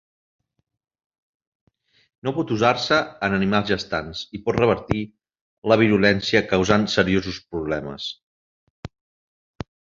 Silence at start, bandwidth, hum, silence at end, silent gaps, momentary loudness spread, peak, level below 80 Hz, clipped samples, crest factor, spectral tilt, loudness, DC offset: 2.25 s; 7.6 kHz; none; 1.1 s; 5.41-5.62 s, 8.23-8.83 s; 21 LU; -2 dBFS; -48 dBFS; under 0.1%; 22 dB; -5.5 dB/octave; -21 LUFS; under 0.1%